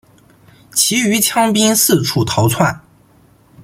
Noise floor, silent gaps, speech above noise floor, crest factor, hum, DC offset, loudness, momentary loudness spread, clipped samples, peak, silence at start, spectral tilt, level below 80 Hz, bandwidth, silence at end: -49 dBFS; none; 36 dB; 16 dB; none; under 0.1%; -13 LUFS; 6 LU; under 0.1%; 0 dBFS; 0.75 s; -3.5 dB/octave; -48 dBFS; 16.5 kHz; 0.85 s